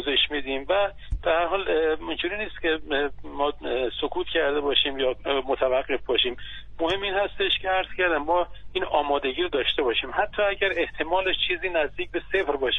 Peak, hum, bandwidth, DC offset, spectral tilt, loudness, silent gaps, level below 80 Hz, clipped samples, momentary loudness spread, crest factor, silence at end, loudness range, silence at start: -8 dBFS; none; 6.8 kHz; under 0.1%; -5.5 dB/octave; -25 LUFS; none; -44 dBFS; under 0.1%; 6 LU; 18 dB; 0 s; 2 LU; 0 s